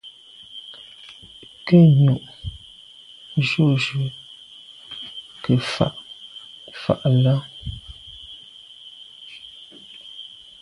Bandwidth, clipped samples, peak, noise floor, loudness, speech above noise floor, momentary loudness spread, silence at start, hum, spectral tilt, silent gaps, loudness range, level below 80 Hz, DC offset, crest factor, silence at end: 11 kHz; under 0.1%; -2 dBFS; -46 dBFS; -20 LUFS; 29 dB; 23 LU; 0.05 s; none; -7.5 dB/octave; none; 7 LU; -50 dBFS; under 0.1%; 20 dB; 0.35 s